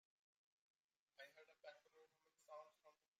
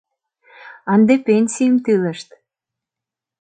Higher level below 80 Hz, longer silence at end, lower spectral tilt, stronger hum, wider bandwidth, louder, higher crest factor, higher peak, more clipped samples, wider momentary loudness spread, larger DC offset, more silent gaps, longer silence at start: second, under -90 dBFS vs -66 dBFS; second, 0.25 s vs 1.2 s; second, -0.5 dB/octave vs -6 dB/octave; neither; first, 15 kHz vs 9.2 kHz; second, -64 LUFS vs -16 LUFS; first, 22 dB vs 16 dB; second, -46 dBFS vs -2 dBFS; neither; second, 2 LU vs 14 LU; neither; neither; first, 1.15 s vs 0.65 s